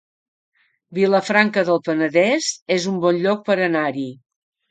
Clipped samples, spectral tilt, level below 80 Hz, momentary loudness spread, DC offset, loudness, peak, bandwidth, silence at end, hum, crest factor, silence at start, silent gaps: under 0.1%; -4.5 dB/octave; -70 dBFS; 7 LU; under 0.1%; -19 LUFS; 0 dBFS; 9.4 kHz; 0.55 s; none; 20 dB; 0.9 s; 2.62-2.66 s